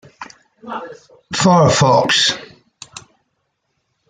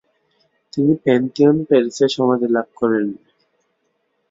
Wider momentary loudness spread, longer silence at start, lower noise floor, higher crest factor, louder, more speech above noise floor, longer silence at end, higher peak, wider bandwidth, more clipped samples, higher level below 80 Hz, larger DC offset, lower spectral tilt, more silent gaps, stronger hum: first, 25 LU vs 8 LU; second, 0.2 s vs 0.75 s; about the same, -70 dBFS vs -68 dBFS; about the same, 16 dB vs 16 dB; first, -13 LUFS vs -17 LUFS; about the same, 55 dB vs 52 dB; about the same, 1.1 s vs 1.15 s; about the same, -2 dBFS vs -2 dBFS; first, 9.6 kHz vs 7.8 kHz; neither; first, -54 dBFS vs -62 dBFS; neither; second, -4 dB/octave vs -6.5 dB/octave; neither; neither